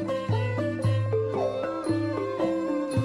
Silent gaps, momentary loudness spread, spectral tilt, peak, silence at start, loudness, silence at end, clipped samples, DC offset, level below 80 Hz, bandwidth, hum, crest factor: none; 2 LU; -8 dB/octave; -14 dBFS; 0 s; -28 LUFS; 0 s; under 0.1%; under 0.1%; -56 dBFS; 10.5 kHz; none; 12 dB